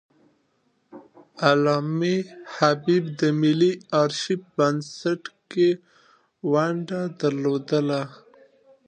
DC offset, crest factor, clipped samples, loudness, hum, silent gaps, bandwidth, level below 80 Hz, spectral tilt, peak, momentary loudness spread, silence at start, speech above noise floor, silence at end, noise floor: under 0.1%; 20 dB; under 0.1%; -23 LUFS; none; none; 9.4 kHz; -74 dBFS; -6 dB/octave; -4 dBFS; 9 LU; 0.95 s; 46 dB; 0.75 s; -68 dBFS